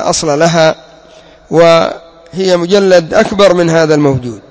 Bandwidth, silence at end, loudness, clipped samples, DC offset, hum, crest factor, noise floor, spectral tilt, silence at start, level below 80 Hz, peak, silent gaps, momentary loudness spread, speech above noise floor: 8 kHz; 0.1 s; -9 LUFS; 0.9%; under 0.1%; none; 10 dB; -38 dBFS; -5 dB/octave; 0 s; -42 dBFS; 0 dBFS; none; 10 LU; 30 dB